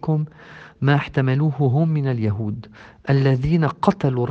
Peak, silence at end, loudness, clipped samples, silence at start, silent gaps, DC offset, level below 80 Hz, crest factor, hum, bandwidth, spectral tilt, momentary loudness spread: 0 dBFS; 0 s; -20 LUFS; under 0.1%; 0.05 s; none; under 0.1%; -46 dBFS; 20 dB; none; 6.4 kHz; -9 dB/octave; 9 LU